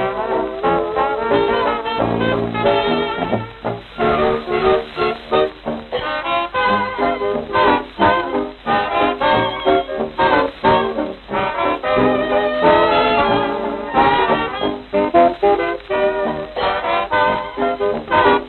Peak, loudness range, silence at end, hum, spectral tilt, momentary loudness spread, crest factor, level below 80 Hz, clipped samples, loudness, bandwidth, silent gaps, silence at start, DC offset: -2 dBFS; 3 LU; 0 s; none; -8 dB/octave; 8 LU; 16 dB; -42 dBFS; under 0.1%; -17 LUFS; 4.5 kHz; none; 0 s; under 0.1%